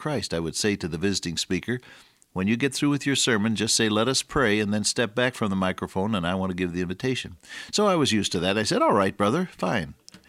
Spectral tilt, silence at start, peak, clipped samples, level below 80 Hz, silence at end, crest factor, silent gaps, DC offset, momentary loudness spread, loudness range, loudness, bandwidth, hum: -4 dB/octave; 0 s; -8 dBFS; under 0.1%; -52 dBFS; 0.1 s; 18 dB; none; under 0.1%; 7 LU; 3 LU; -24 LUFS; 15.5 kHz; none